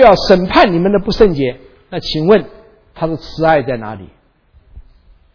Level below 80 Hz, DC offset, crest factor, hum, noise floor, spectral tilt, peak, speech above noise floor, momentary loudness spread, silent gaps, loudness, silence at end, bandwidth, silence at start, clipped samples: -32 dBFS; under 0.1%; 14 dB; none; -50 dBFS; -6.5 dB/octave; 0 dBFS; 38 dB; 15 LU; none; -13 LUFS; 0.55 s; 5.4 kHz; 0 s; 0.5%